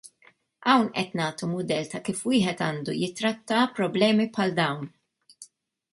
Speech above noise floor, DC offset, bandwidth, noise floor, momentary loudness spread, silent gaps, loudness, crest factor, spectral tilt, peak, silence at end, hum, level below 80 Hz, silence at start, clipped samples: 35 dB; under 0.1%; 11.5 kHz; -61 dBFS; 8 LU; none; -26 LUFS; 20 dB; -5 dB/octave; -8 dBFS; 0.5 s; none; -68 dBFS; 0.05 s; under 0.1%